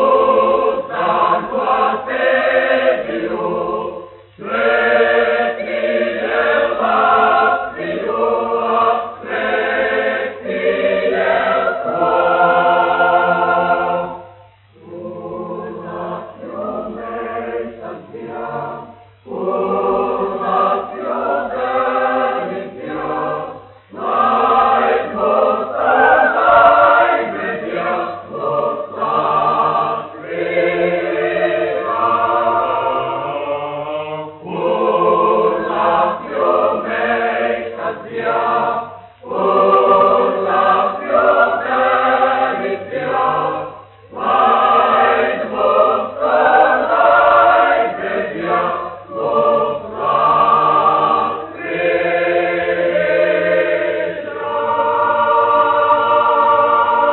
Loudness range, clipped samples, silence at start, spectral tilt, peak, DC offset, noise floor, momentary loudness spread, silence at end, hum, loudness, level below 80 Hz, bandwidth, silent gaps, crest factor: 7 LU; under 0.1%; 0 s; -2.5 dB/octave; 0 dBFS; under 0.1%; -45 dBFS; 13 LU; 0 s; none; -15 LUFS; -54 dBFS; 4.2 kHz; none; 14 dB